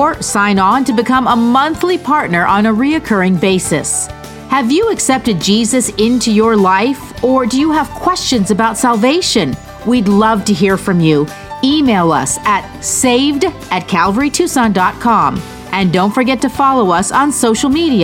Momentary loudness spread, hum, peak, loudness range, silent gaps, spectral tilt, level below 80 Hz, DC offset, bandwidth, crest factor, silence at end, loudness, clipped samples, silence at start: 5 LU; none; 0 dBFS; 1 LU; none; -4 dB/octave; -38 dBFS; under 0.1%; 17 kHz; 12 dB; 0 s; -12 LUFS; under 0.1%; 0 s